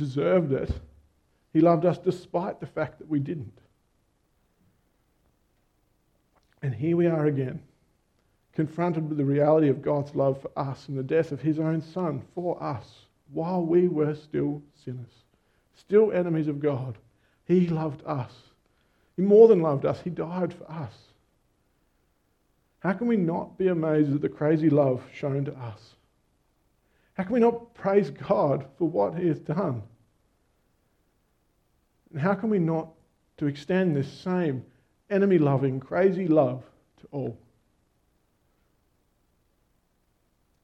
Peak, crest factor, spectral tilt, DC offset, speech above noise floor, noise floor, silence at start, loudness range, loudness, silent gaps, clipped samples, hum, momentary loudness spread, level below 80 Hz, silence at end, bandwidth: -4 dBFS; 22 dB; -9.5 dB/octave; under 0.1%; 45 dB; -70 dBFS; 0 s; 9 LU; -26 LUFS; none; under 0.1%; none; 16 LU; -56 dBFS; 3.25 s; 8.4 kHz